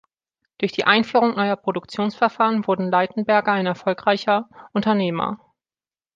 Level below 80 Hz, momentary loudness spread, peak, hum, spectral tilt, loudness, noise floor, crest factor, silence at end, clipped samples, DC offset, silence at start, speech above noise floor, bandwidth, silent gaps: -66 dBFS; 9 LU; -2 dBFS; none; -6.5 dB/octave; -21 LUFS; under -90 dBFS; 20 dB; 0.8 s; under 0.1%; under 0.1%; 0.6 s; over 70 dB; 7.6 kHz; none